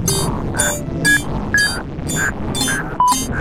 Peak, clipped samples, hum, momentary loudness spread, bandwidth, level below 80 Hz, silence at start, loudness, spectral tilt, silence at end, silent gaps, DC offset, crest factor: -2 dBFS; under 0.1%; none; 5 LU; 16.5 kHz; -30 dBFS; 0 s; -17 LUFS; -3 dB/octave; 0 s; none; under 0.1%; 16 dB